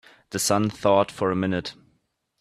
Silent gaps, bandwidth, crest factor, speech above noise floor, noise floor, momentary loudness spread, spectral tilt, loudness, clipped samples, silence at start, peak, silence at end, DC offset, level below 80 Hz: none; 14.5 kHz; 20 dB; 48 dB; -71 dBFS; 11 LU; -4.5 dB/octave; -23 LUFS; under 0.1%; 0.3 s; -6 dBFS; 0.7 s; under 0.1%; -60 dBFS